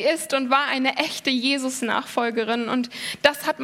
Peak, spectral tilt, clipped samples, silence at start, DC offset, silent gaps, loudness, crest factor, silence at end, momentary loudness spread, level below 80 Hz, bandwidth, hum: 0 dBFS; -2 dB/octave; under 0.1%; 0 s; under 0.1%; none; -22 LUFS; 22 dB; 0 s; 5 LU; -70 dBFS; 17 kHz; none